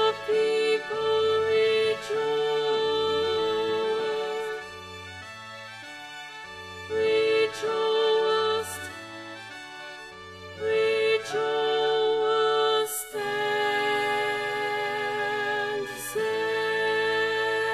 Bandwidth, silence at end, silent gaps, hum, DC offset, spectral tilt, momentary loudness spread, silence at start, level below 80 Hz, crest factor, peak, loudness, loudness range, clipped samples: 13.5 kHz; 0 s; none; none; under 0.1%; -2.5 dB/octave; 16 LU; 0 s; -66 dBFS; 14 dB; -12 dBFS; -26 LUFS; 5 LU; under 0.1%